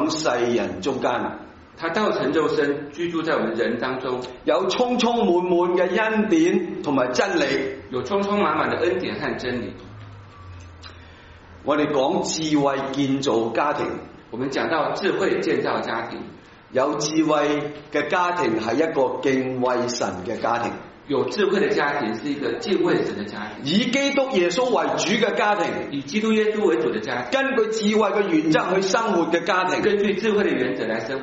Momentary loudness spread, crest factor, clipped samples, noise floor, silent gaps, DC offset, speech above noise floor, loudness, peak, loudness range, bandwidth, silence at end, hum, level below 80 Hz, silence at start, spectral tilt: 9 LU; 18 dB; under 0.1%; -45 dBFS; none; under 0.1%; 23 dB; -22 LUFS; -4 dBFS; 4 LU; 8 kHz; 0 s; none; -56 dBFS; 0 s; -3.5 dB/octave